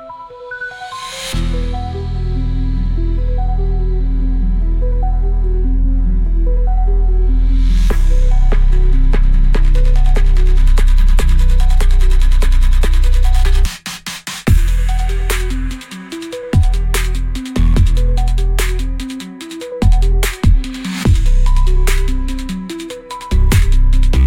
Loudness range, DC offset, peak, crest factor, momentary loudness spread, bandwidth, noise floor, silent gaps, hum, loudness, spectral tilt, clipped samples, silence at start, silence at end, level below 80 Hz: 4 LU; under 0.1%; -2 dBFS; 10 dB; 10 LU; 13.5 kHz; -31 dBFS; none; none; -17 LUFS; -5.5 dB/octave; under 0.1%; 0 s; 0 s; -12 dBFS